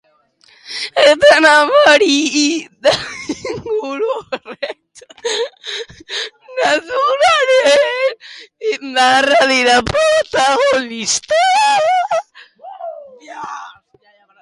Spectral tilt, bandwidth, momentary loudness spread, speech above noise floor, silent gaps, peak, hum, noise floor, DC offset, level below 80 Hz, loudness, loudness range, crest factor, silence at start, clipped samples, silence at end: -2 dB/octave; 11.5 kHz; 18 LU; 40 dB; none; 0 dBFS; none; -53 dBFS; under 0.1%; -50 dBFS; -13 LUFS; 9 LU; 14 dB; 0.65 s; under 0.1%; 0.7 s